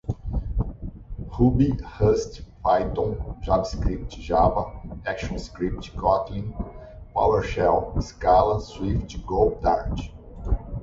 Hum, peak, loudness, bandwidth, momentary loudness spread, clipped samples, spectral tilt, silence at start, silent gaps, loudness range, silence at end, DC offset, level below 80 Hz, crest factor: none; -6 dBFS; -25 LUFS; 7.8 kHz; 14 LU; under 0.1%; -7.5 dB/octave; 0.05 s; none; 3 LU; 0 s; under 0.1%; -32 dBFS; 18 dB